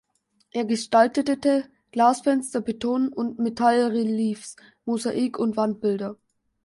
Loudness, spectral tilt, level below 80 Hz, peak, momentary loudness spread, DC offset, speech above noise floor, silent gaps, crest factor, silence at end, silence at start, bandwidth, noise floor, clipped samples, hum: -24 LUFS; -5 dB/octave; -66 dBFS; -4 dBFS; 11 LU; under 0.1%; 44 dB; none; 20 dB; 0.5 s; 0.55 s; 11.5 kHz; -66 dBFS; under 0.1%; none